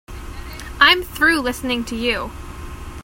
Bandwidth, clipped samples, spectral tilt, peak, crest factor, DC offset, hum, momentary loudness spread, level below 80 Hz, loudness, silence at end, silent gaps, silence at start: 16.5 kHz; under 0.1%; -3 dB/octave; 0 dBFS; 20 dB; under 0.1%; none; 21 LU; -36 dBFS; -17 LUFS; 0 s; none; 0.1 s